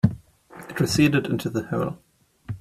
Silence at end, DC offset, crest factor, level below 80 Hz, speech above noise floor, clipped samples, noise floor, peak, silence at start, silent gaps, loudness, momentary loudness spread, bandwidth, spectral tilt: 0 s; under 0.1%; 20 dB; -50 dBFS; 23 dB; under 0.1%; -46 dBFS; -4 dBFS; 0.05 s; none; -23 LUFS; 23 LU; 15.5 kHz; -6 dB/octave